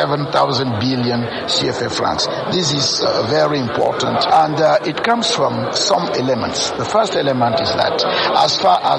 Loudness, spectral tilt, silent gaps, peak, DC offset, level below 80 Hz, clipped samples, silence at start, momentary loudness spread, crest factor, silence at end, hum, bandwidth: -16 LUFS; -4 dB/octave; none; -2 dBFS; under 0.1%; -48 dBFS; under 0.1%; 0 s; 4 LU; 14 dB; 0 s; none; 11.5 kHz